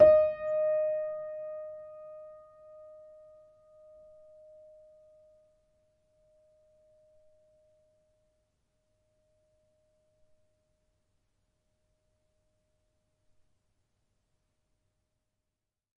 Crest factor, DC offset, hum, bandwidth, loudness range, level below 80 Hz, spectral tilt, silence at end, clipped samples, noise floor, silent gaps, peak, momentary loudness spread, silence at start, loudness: 26 dB; under 0.1%; none; 4.7 kHz; 25 LU; -68 dBFS; -8 dB/octave; 13.65 s; under 0.1%; -88 dBFS; none; -8 dBFS; 27 LU; 0 s; -30 LUFS